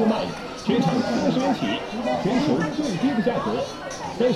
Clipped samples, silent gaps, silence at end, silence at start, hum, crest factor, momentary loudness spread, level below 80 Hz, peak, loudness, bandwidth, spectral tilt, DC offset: under 0.1%; none; 0 s; 0 s; none; 16 dB; 7 LU; -52 dBFS; -8 dBFS; -24 LUFS; 12.5 kHz; -6 dB/octave; under 0.1%